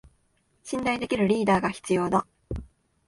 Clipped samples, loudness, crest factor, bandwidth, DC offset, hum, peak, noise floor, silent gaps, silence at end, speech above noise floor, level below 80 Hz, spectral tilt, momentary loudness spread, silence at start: under 0.1%; -25 LUFS; 18 dB; 11.5 kHz; under 0.1%; none; -10 dBFS; -68 dBFS; none; 0.45 s; 44 dB; -48 dBFS; -6 dB/octave; 16 LU; 0.65 s